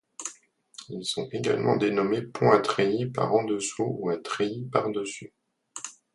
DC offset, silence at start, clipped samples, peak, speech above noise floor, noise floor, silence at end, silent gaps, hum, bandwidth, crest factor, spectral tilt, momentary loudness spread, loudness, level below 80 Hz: under 0.1%; 0.2 s; under 0.1%; -4 dBFS; 27 dB; -54 dBFS; 0.25 s; none; none; 11.5 kHz; 24 dB; -5 dB/octave; 17 LU; -26 LUFS; -68 dBFS